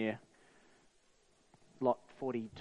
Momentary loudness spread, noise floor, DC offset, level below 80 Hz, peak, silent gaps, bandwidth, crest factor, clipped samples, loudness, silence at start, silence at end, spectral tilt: 6 LU; -70 dBFS; under 0.1%; -76 dBFS; -18 dBFS; none; 10 kHz; 24 dB; under 0.1%; -38 LUFS; 0 s; 0 s; -7 dB/octave